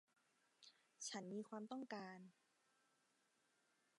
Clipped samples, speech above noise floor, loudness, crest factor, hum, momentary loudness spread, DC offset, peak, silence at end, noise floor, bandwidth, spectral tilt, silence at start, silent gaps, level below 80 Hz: under 0.1%; 31 dB; -53 LUFS; 20 dB; none; 17 LU; under 0.1%; -38 dBFS; 1.65 s; -83 dBFS; 11 kHz; -3.5 dB/octave; 0.6 s; none; under -90 dBFS